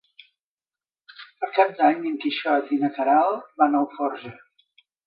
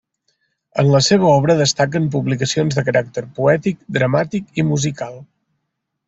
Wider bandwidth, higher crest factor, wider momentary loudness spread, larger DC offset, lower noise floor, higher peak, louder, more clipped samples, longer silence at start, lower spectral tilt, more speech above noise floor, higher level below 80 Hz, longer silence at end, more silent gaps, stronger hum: second, 5.2 kHz vs 8 kHz; about the same, 20 dB vs 18 dB; about the same, 9 LU vs 10 LU; neither; first, under -90 dBFS vs -75 dBFS; second, -4 dBFS vs 0 dBFS; second, -22 LUFS vs -17 LUFS; neither; first, 1.2 s vs 0.75 s; first, -8 dB/octave vs -5 dB/octave; first, over 68 dB vs 59 dB; second, -78 dBFS vs -52 dBFS; about the same, 0.75 s vs 0.85 s; neither; neither